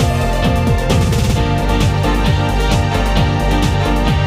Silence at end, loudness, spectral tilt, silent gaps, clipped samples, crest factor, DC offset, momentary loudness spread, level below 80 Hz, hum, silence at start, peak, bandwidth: 0 s; -15 LUFS; -6 dB/octave; none; under 0.1%; 12 dB; under 0.1%; 1 LU; -18 dBFS; none; 0 s; 0 dBFS; 15.5 kHz